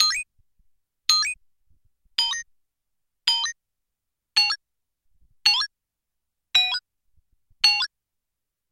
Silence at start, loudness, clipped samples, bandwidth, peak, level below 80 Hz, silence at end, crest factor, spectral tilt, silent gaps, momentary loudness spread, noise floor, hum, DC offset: 0 s; -22 LUFS; under 0.1%; 16.5 kHz; 0 dBFS; -64 dBFS; 0.85 s; 28 dB; 4 dB/octave; none; 11 LU; -85 dBFS; none; under 0.1%